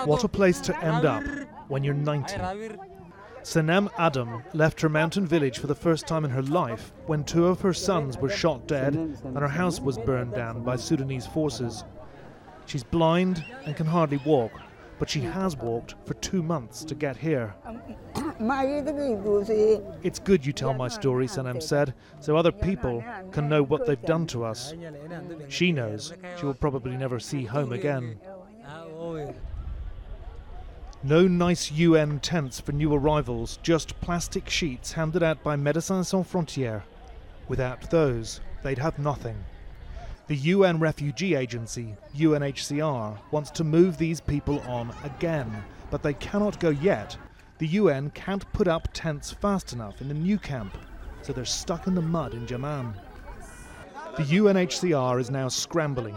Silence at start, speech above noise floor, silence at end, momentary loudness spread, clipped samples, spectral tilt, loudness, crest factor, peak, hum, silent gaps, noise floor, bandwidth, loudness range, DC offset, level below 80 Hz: 0 s; 20 dB; 0 s; 17 LU; under 0.1%; -6 dB/octave; -27 LUFS; 20 dB; -8 dBFS; none; none; -46 dBFS; 16.5 kHz; 5 LU; under 0.1%; -44 dBFS